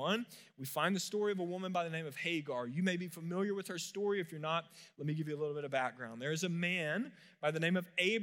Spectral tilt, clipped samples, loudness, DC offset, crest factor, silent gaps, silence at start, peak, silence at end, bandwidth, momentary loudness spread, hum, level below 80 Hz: -5 dB/octave; under 0.1%; -37 LUFS; under 0.1%; 18 dB; none; 0 s; -18 dBFS; 0 s; 16 kHz; 7 LU; none; under -90 dBFS